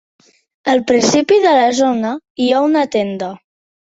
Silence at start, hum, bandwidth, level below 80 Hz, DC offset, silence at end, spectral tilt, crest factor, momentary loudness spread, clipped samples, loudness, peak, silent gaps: 0.65 s; none; 8 kHz; -58 dBFS; under 0.1%; 0.6 s; -4 dB/octave; 14 dB; 11 LU; under 0.1%; -14 LUFS; 0 dBFS; 2.30-2.35 s